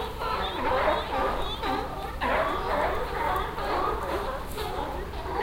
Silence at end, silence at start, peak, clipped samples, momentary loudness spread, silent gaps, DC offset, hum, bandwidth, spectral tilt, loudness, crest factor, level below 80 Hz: 0 s; 0 s; -12 dBFS; under 0.1%; 7 LU; none; under 0.1%; none; 16 kHz; -5 dB/octave; -29 LUFS; 16 dB; -38 dBFS